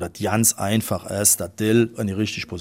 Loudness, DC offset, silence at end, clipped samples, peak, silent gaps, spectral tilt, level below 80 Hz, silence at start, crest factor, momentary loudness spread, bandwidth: -20 LUFS; under 0.1%; 0 s; under 0.1%; -2 dBFS; none; -4 dB/octave; -52 dBFS; 0 s; 20 dB; 8 LU; 16.5 kHz